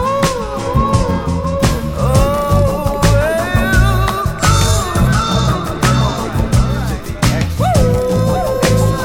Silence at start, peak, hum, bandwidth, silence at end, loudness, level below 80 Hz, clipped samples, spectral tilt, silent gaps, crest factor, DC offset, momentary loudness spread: 0 s; 0 dBFS; none; 18 kHz; 0 s; -14 LUFS; -20 dBFS; under 0.1%; -5.5 dB/octave; none; 14 dB; under 0.1%; 5 LU